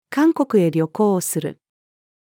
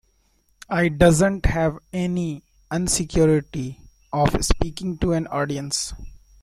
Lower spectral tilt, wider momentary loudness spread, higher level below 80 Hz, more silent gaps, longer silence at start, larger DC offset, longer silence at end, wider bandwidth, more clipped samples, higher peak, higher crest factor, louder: about the same, -6 dB/octave vs -5 dB/octave; second, 8 LU vs 14 LU; second, -78 dBFS vs -32 dBFS; neither; second, 0.1 s vs 0.7 s; neither; first, 0.85 s vs 0.25 s; first, 18.5 kHz vs 15 kHz; neither; second, -6 dBFS vs -2 dBFS; about the same, 16 dB vs 20 dB; first, -19 LUFS vs -22 LUFS